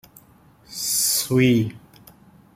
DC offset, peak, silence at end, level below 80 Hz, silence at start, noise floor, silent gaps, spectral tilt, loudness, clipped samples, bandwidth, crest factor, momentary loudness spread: under 0.1%; -6 dBFS; 0.75 s; -58 dBFS; 0.7 s; -53 dBFS; none; -4 dB/octave; -20 LUFS; under 0.1%; 16.5 kHz; 18 dB; 12 LU